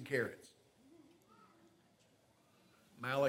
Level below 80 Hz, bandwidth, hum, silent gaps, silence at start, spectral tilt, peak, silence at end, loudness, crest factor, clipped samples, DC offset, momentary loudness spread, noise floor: -88 dBFS; 16.5 kHz; none; none; 0 s; -5.5 dB/octave; -22 dBFS; 0 s; -41 LUFS; 22 dB; under 0.1%; under 0.1%; 27 LU; -71 dBFS